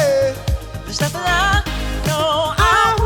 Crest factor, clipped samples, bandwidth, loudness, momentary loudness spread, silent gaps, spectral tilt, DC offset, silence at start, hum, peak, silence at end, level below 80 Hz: 16 dB; under 0.1%; over 20 kHz; -17 LUFS; 11 LU; none; -4 dB/octave; under 0.1%; 0 s; none; 0 dBFS; 0 s; -26 dBFS